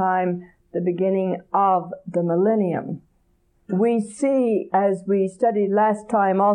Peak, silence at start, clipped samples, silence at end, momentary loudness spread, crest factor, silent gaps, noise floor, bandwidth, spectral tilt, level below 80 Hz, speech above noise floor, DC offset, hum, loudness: -8 dBFS; 0 s; under 0.1%; 0 s; 8 LU; 14 dB; none; -63 dBFS; 10.5 kHz; -8 dB/octave; -66 dBFS; 42 dB; under 0.1%; none; -21 LUFS